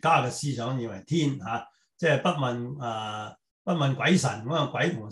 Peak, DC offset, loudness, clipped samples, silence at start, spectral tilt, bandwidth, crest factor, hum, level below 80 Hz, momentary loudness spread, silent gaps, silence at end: -8 dBFS; under 0.1%; -27 LUFS; under 0.1%; 0.05 s; -5.5 dB/octave; 12 kHz; 18 dB; none; -66 dBFS; 11 LU; 3.51-3.65 s; 0 s